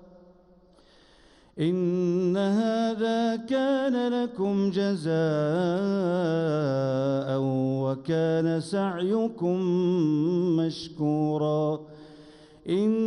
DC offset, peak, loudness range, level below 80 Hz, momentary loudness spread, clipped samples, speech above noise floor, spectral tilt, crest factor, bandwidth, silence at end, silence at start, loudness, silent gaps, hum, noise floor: under 0.1%; -14 dBFS; 1 LU; -66 dBFS; 4 LU; under 0.1%; 32 dB; -7.5 dB/octave; 12 dB; 11 kHz; 0 s; 1.55 s; -26 LUFS; none; none; -57 dBFS